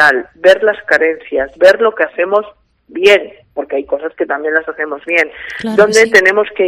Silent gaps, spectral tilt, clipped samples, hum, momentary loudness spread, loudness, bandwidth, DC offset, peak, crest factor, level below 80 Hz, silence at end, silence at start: none; -3 dB/octave; 0.8%; none; 12 LU; -12 LUFS; 15 kHz; under 0.1%; 0 dBFS; 12 dB; -52 dBFS; 0 s; 0 s